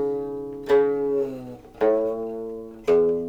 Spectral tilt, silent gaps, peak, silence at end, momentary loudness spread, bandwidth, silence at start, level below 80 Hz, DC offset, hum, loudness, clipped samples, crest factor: -7 dB/octave; none; -8 dBFS; 0 s; 13 LU; 7.8 kHz; 0 s; -54 dBFS; under 0.1%; none; -24 LUFS; under 0.1%; 16 dB